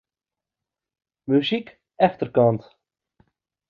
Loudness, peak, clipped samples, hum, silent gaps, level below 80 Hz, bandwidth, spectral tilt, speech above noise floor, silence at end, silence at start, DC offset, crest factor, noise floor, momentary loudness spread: -22 LUFS; -4 dBFS; under 0.1%; none; none; -66 dBFS; 6.6 kHz; -8.5 dB/octave; 69 dB; 1.1 s; 1.3 s; under 0.1%; 20 dB; -89 dBFS; 10 LU